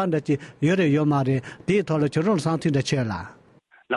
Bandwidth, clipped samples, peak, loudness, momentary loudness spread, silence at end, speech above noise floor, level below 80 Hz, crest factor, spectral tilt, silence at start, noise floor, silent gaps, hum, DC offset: 11.5 kHz; under 0.1%; -10 dBFS; -23 LUFS; 7 LU; 0 s; 34 dB; -54 dBFS; 12 dB; -7 dB/octave; 0 s; -56 dBFS; none; none; under 0.1%